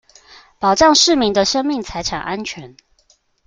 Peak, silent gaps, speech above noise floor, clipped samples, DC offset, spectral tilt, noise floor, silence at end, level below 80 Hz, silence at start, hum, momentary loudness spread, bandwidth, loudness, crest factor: 0 dBFS; none; 42 dB; under 0.1%; under 0.1%; -2.5 dB/octave; -58 dBFS; 0.8 s; -44 dBFS; 0.6 s; none; 15 LU; 10 kHz; -15 LUFS; 18 dB